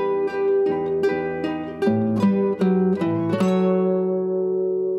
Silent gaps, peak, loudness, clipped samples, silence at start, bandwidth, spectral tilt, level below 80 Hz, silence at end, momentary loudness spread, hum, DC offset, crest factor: none; -8 dBFS; -21 LUFS; under 0.1%; 0 s; 8.4 kHz; -8.5 dB/octave; -64 dBFS; 0 s; 4 LU; none; under 0.1%; 12 dB